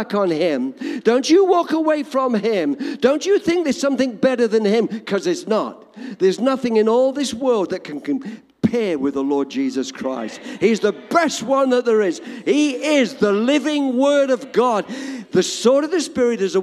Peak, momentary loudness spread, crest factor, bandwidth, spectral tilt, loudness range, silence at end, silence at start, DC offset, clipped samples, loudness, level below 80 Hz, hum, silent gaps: -2 dBFS; 9 LU; 16 dB; 13.5 kHz; -4.5 dB/octave; 3 LU; 0 s; 0 s; under 0.1%; under 0.1%; -19 LUFS; -62 dBFS; none; none